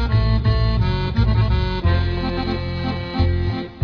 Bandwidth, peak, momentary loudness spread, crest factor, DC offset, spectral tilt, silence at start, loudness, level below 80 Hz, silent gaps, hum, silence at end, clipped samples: 5.4 kHz; -6 dBFS; 6 LU; 14 dB; under 0.1%; -8.5 dB/octave; 0 s; -20 LUFS; -24 dBFS; none; none; 0 s; under 0.1%